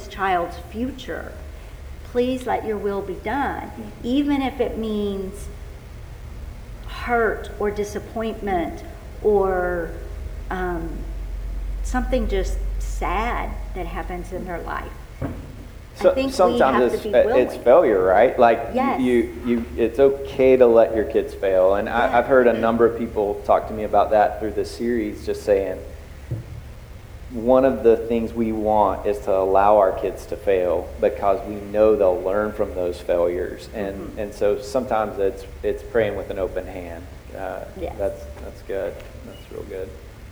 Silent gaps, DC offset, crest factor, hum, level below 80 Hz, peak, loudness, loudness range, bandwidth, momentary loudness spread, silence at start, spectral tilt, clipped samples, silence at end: none; under 0.1%; 20 dB; none; -34 dBFS; -2 dBFS; -21 LUFS; 10 LU; over 20 kHz; 20 LU; 0 s; -6.5 dB/octave; under 0.1%; 0 s